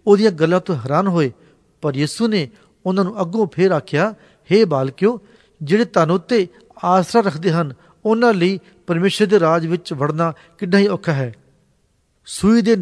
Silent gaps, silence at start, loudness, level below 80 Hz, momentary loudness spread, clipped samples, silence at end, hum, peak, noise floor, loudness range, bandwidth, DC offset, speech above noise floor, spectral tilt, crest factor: none; 0.05 s; -18 LUFS; -54 dBFS; 10 LU; under 0.1%; 0 s; none; 0 dBFS; -62 dBFS; 2 LU; 11 kHz; under 0.1%; 45 dB; -6.5 dB/octave; 16 dB